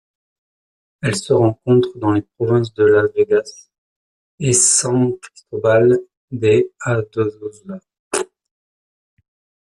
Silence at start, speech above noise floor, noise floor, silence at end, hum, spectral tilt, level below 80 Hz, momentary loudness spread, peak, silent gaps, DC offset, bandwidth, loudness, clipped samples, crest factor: 1.05 s; over 74 dB; under -90 dBFS; 1.5 s; none; -4.5 dB/octave; -54 dBFS; 18 LU; 0 dBFS; 3.78-4.38 s, 6.17-6.28 s, 7.99-8.11 s; under 0.1%; 12.5 kHz; -17 LUFS; under 0.1%; 18 dB